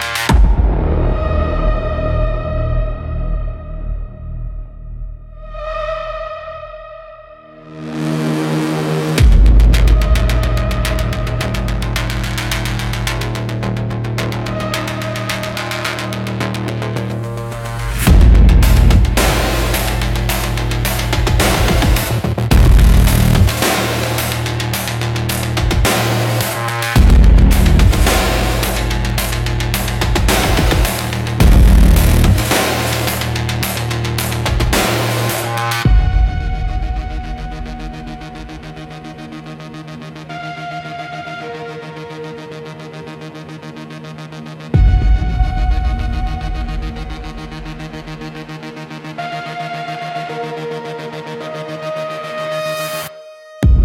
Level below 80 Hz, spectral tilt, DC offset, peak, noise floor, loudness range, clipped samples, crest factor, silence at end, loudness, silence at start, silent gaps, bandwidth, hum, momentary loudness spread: -18 dBFS; -5 dB/octave; under 0.1%; 0 dBFS; -38 dBFS; 14 LU; under 0.1%; 14 dB; 0 s; -16 LUFS; 0 s; none; 17 kHz; none; 19 LU